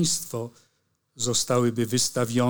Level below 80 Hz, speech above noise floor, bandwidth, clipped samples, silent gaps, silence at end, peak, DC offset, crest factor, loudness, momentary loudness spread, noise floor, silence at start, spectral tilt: -60 dBFS; 46 dB; over 20 kHz; under 0.1%; none; 0 s; -8 dBFS; under 0.1%; 18 dB; -25 LUFS; 11 LU; -71 dBFS; 0 s; -4 dB/octave